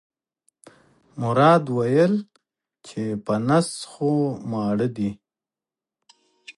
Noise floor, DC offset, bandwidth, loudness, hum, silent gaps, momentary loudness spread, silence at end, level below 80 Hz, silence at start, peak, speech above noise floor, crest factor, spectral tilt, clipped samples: under -90 dBFS; under 0.1%; 11.5 kHz; -22 LUFS; none; none; 13 LU; 0.05 s; -62 dBFS; 1.15 s; -4 dBFS; over 69 dB; 20 dB; -6.5 dB/octave; under 0.1%